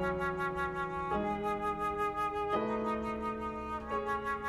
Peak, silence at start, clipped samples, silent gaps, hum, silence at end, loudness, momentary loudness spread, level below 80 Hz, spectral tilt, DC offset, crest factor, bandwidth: -20 dBFS; 0 s; under 0.1%; none; none; 0 s; -35 LUFS; 4 LU; -52 dBFS; -6.5 dB/octave; under 0.1%; 14 dB; 14 kHz